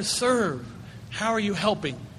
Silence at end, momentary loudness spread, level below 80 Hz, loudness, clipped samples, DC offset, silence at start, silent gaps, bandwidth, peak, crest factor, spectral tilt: 0 s; 15 LU; -54 dBFS; -25 LUFS; under 0.1%; under 0.1%; 0 s; none; 13.5 kHz; -8 dBFS; 18 dB; -3.5 dB/octave